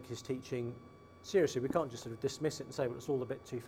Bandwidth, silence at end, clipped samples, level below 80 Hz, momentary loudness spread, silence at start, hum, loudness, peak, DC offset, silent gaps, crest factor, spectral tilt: 16 kHz; 0 s; under 0.1%; -70 dBFS; 11 LU; 0 s; none; -37 LUFS; -18 dBFS; under 0.1%; none; 20 dB; -5.5 dB/octave